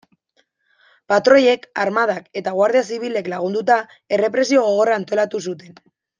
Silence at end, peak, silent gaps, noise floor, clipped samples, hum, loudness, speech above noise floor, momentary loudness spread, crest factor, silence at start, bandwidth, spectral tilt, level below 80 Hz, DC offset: 0.6 s; -2 dBFS; none; -65 dBFS; under 0.1%; none; -18 LUFS; 47 dB; 10 LU; 18 dB; 1.1 s; 9.6 kHz; -4.5 dB/octave; -70 dBFS; under 0.1%